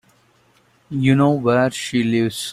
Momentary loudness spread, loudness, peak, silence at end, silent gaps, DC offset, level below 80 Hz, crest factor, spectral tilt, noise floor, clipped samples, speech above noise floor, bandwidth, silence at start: 5 LU; -18 LUFS; -4 dBFS; 0 s; none; under 0.1%; -56 dBFS; 16 dB; -6 dB/octave; -57 dBFS; under 0.1%; 40 dB; 15.5 kHz; 0.9 s